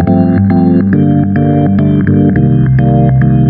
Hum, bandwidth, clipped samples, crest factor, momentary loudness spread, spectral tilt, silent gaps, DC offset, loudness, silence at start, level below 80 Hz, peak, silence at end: none; 4.4 kHz; under 0.1%; 8 dB; 1 LU; -13 dB/octave; none; under 0.1%; -9 LUFS; 0 s; -28 dBFS; 0 dBFS; 0 s